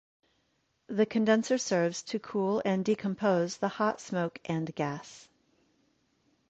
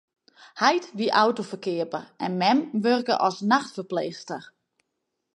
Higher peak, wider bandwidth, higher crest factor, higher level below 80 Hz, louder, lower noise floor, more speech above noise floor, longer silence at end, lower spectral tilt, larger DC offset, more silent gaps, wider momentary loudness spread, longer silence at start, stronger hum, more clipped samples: second, -14 dBFS vs -4 dBFS; second, 8.4 kHz vs 11.5 kHz; about the same, 18 dB vs 22 dB; first, -72 dBFS vs -78 dBFS; second, -30 LUFS vs -24 LUFS; second, -75 dBFS vs -80 dBFS; second, 45 dB vs 56 dB; first, 1.25 s vs 0.9 s; about the same, -5.5 dB/octave vs -5 dB/octave; neither; neither; about the same, 9 LU vs 11 LU; first, 0.9 s vs 0.4 s; neither; neither